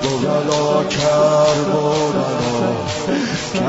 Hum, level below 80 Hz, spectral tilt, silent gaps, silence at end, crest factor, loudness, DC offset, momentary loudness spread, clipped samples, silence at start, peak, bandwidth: none; -46 dBFS; -5 dB/octave; none; 0 s; 12 dB; -17 LUFS; under 0.1%; 6 LU; under 0.1%; 0 s; -4 dBFS; 8 kHz